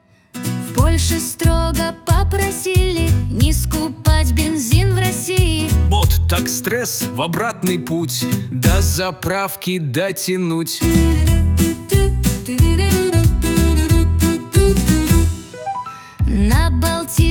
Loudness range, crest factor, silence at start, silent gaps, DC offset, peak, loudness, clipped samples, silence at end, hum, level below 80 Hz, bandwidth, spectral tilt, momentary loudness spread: 3 LU; 14 dB; 0.35 s; none; under 0.1%; -2 dBFS; -17 LUFS; under 0.1%; 0 s; none; -22 dBFS; over 20 kHz; -5 dB/octave; 6 LU